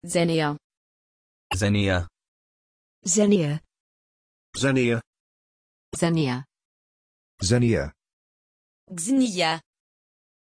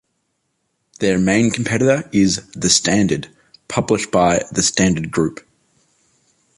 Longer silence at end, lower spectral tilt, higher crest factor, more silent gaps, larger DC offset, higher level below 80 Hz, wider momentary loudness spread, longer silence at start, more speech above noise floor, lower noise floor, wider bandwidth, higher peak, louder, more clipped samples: second, 0.9 s vs 1.25 s; about the same, -5 dB/octave vs -4 dB/octave; about the same, 20 dB vs 16 dB; first, 0.64-0.70 s, 0.77-1.50 s, 2.28-3.02 s, 3.80-4.53 s, 5.07-5.13 s, 5.20-5.92 s, 6.65-7.38 s, 8.13-8.87 s vs none; neither; about the same, -50 dBFS vs -46 dBFS; first, 14 LU vs 8 LU; second, 0 s vs 1 s; first, over 68 dB vs 54 dB; first, under -90 dBFS vs -70 dBFS; about the same, 11 kHz vs 11.5 kHz; second, -8 dBFS vs -2 dBFS; second, -24 LUFS vs -17 LUFS; neither